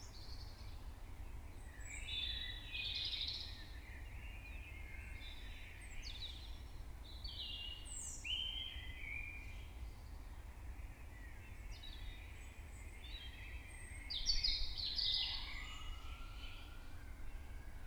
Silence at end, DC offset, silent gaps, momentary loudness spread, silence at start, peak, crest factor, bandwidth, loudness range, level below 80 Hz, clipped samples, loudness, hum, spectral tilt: 0 s; under 0.1%; none; 17 LU; 0 s; -24 dBFS; 22 dB; over 20 kHz; 13 LU; -50 dBFS; under 0.1%; -46 LUFS; none; -2 dB/octave